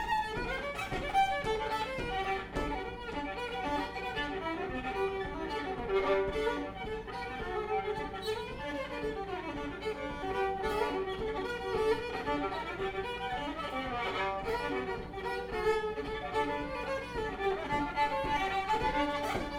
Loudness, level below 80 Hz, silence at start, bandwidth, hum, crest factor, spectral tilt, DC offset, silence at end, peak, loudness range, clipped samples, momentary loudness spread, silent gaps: -35 LUFS; -48 dBFS; 0 s; 16.5 kHz; none; 16 dB; -5 dB/octave; under 0.1%; 0 s; -18 dBFS; 3 LU; under 0.1%; 7 LU; none